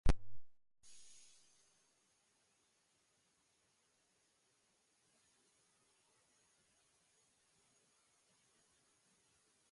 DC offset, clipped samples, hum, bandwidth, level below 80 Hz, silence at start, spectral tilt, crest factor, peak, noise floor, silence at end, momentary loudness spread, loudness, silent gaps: under 0.1%; under 0.1%; none; 11.5 kHz; -50 dBFS; 0.05 s; -5.5 dB/octave; 24 dB; -20 dBFS; -79 dBFS; 8.7 s; 25 LU; -43 LUFS; none